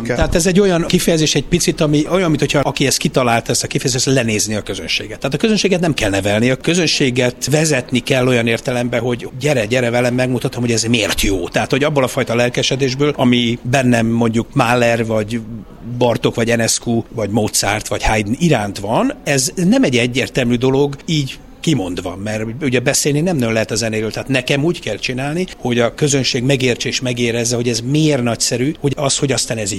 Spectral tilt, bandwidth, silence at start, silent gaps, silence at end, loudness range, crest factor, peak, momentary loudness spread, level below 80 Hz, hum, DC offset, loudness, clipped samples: -4.5 dB/octave; 16 kHz; 0 s; none; 0 s; 2 LU; 16 dB; 0 dBFS; 6 LU; -34 dBFS; none; under 0.1%; -16 LUFS; under 0.1%